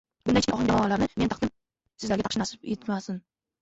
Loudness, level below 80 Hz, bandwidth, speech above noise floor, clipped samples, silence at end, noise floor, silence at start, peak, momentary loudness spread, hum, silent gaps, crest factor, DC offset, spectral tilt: -27 LUFS; -50 dBFS; 8 kHz; 40 dB; under 0.1%; 0.45 s; -66 dBFS; 0.25 s; -10 dBFS; 10 LU; none; none; 18 dB; under 0.1%; -5 dB/octave